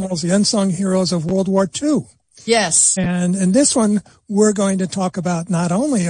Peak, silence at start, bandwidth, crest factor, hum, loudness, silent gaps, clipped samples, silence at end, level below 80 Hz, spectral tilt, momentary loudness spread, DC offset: -2 dBFS; 0 s; 10.5 kHz; 16 dB; none; -17 LUFS; none; under 0.1%; 0 s; -52 dBFS; -4.5 dB/octave; 8 LU; under 0.1%